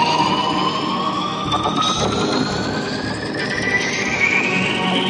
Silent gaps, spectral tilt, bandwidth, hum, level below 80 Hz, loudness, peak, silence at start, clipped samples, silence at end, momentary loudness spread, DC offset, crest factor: none; -4 dB/octave; 11.5 kHz; none; -46 dBFS; -18 LUFS; -4 dBFS; 0 s; under 0.1%; 0 s; 7 LU; under 0.1%; 14 dB